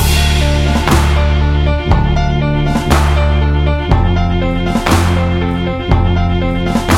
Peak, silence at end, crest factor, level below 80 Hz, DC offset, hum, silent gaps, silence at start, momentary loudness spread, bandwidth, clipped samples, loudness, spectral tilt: 0 dBFS; 0 s; 12 dB; -16 dBFS; under 0.1%; none; none; 0 s; 3 LU; 16 kHz; under 0.1%; -13 LUFS; -6 dB/octave